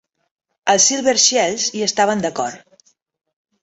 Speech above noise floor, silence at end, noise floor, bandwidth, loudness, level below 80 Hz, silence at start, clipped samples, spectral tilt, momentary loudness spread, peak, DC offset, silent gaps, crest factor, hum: 39 dB; 1.05 s; -56 dBFS; 8.2 kHz; -16 LUFS; -62 dBFS; 0.65 s; under 0.1%; -1.5 dB/octave; 11 LU; -2 dBFS; under 0.1%; none; 18 dB; none